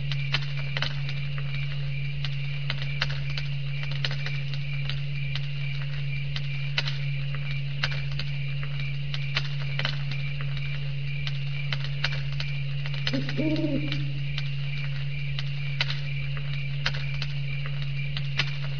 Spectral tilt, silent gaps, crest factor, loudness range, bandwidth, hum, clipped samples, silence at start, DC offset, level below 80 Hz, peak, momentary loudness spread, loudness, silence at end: -6 dB/octave; none; 20 dB; 1 LU; 5.4 kHz; none; under 0.1%; 0 s; 3%; -44 dBFS; -8 dBFS; 3 LU; -30 LUFS; 0 s